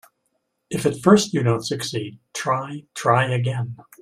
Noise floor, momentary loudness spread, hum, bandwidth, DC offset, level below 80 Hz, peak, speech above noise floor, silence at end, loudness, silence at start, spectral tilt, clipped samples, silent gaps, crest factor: -73 dBFS; 15 LU; none; 15 kHz; under 0.1%; -60 dBFS; -2 dBFS; 52 dB; 0.2 s; -21 LUFS; 0.7 s; -5.5 dB/octave; under 0.1%; none; 20 dB